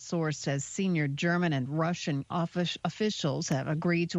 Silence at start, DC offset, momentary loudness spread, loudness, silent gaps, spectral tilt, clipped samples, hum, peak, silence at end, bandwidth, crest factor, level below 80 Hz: 0 s; under 0.1%; 4 LU; -30 LUFS; none; -5.5 dB/octave; under 0.1%; none; -16 dBFS; 0 s; 8.2 kHz; 14 dB; -68 dBFS